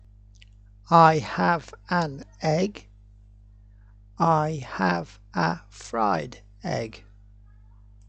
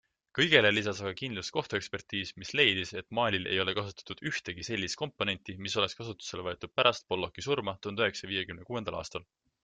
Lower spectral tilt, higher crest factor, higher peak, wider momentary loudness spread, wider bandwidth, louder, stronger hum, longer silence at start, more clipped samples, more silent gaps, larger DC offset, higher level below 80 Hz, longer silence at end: first, -6.5 dB/octave vs -3.5 dB/octave; about the same, 24 dB vs 24 dB; first, -4 dBFS vs -8 dBFS; first, 15 LU vs 12 LU; about the same, 8.6 kHz vs 9.4 kHz; first, -24 LUFS vs -31 LUFS; first, 50 Hz at -50 dBFS vs none; first, 0.9 s vs 0.35 s; neither; neither; neither; first, -52 dBFS vs -66 dBFS; first, 1.1 s vs 0.4 s